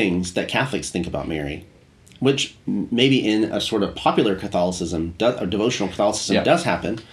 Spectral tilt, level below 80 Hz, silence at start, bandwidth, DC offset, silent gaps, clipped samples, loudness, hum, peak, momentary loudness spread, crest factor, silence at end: -4.5 dB/octave; -46 dBFS; 0 s; 13 kHz; under 0.1%; none; under 0.1%; -21 LUFS; none; -2 dBFS; 8 LU; 20 dB; 0 s